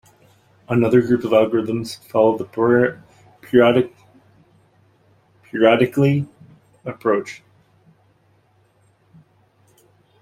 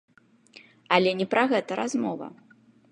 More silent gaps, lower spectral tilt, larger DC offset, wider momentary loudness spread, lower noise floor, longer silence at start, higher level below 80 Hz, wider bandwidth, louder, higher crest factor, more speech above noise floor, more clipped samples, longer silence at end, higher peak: neither; first, -7.5 dB/octave vs -5 dB/octave; neither; first, 16 LU vs 12 LU; first, -59 dBFS vs -55 dBFS; second, 0.7 s vs 0.9 s; first, -58 dBFS vs -78 dBFS; first, 15 kHz vs 10.5 kHz; first, -18 LUFS vs -25 LUFS; about the same, 20 dB vs 22 dB; first, 42 dB vs 30 dB; neither; first, 2.85 s vs 0.6 s; first, -2 dBFS vs -6 dBFS